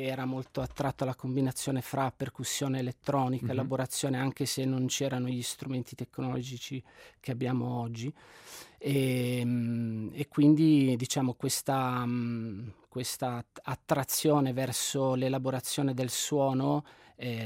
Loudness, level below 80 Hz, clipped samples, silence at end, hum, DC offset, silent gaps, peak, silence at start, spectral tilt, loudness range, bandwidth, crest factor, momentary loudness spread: -31 LUFS; -64 dBFS; under 0.1%; 0 s; none; under 0.1%; none; -12 dBFS; 0 s; -5 dB/octave; 6 LU; 16 kHz; 18 dB; 13 LU